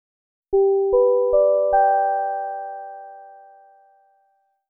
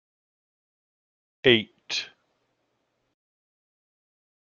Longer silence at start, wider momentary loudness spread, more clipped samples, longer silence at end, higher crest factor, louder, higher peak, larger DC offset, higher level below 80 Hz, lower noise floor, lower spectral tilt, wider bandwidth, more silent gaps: second, 0.5 s vs 1.45 s; first, 18 LU vs 11 LU; neither; second, 1.4 s vs 2.4 s; second, 14 dB vs 28 dB; first, -19 LUFS vs -24 LUFS; second, -8 dBFS vs -2 dBFS; neither; first, -52 dBFS vs -66 dBFS; second, -66 dBFS vs -75 dBFS; first, -12 dB/octave vs -2 dB/octave; second, 1.7 kHz vs 7.2 kHz; neither